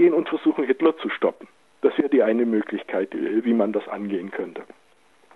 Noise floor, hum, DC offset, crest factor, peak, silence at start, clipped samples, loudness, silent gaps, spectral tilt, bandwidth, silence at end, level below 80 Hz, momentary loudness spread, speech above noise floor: -59 dBFS; none; under 0.1%; 18 dB; -6 dBFS; 0 s; under 0.1%; -23 LUFS; none; -8 dB/octave; 4.2 kHz; 0.7 s; -82 dBFS; 9 LU; 36 dB